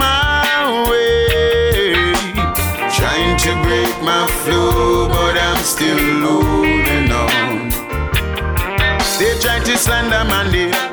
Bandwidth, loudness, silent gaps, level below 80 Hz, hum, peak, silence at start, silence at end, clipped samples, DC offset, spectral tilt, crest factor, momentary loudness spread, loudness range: over 20 kHz; -14 LUFS; none; -24 dBFS; none; -6 dBFS; 0 s; 0 s; under 0.1%; under 0.1%; -4 dB/octave; 10 dB; 4 LU; 1 LU